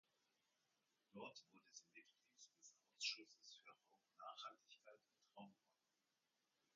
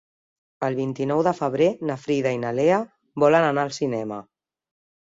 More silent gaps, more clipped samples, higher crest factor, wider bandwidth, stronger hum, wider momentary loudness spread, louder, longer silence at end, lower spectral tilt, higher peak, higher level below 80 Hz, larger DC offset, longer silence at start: neither; neither; first, 30 dB vs 18 dB; about the same, 7.4 kHz vs 7.8 kHz; neither; first, 21 LU vs 11 LU; second, -56 LUFS vs -23 LUFS; first, 1.2 s vs 0.8 s; second, 0.5 dB/octave vs -6.5 dB/octave; second, -32 dBFS vs -6 dBFS; second, under -90 dBFS vs -66 dBFS; neither; first, 1.15 s vs 0.6 s